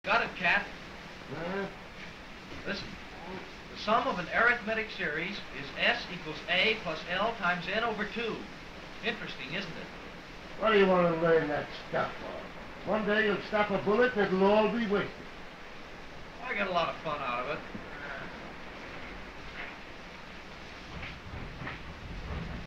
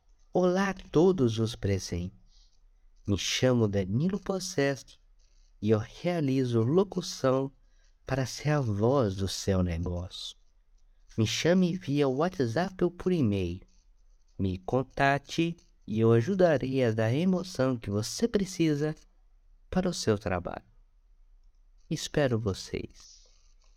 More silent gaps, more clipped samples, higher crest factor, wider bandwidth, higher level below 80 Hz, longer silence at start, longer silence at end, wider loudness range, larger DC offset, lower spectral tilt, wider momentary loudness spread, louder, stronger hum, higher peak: neither; neither; about the same, 20 dB vs 18 dB; second, 10.5 kHz vs 15.5 kHz; about the same, -52 dBFS vs -52 dBFS; second, 0.05 s vs 0.35 s; second, 0 s vs 0.75 s; first, 13 LU vs 5 LU; neither; about the same, -5.5 dB/octave vs -6 dB/octave; first, 19 LU vs 12 LU; about the same, -31 LUFS vs -29 LUFS; neither; about the same, -12 dBFS vs -10 dBFS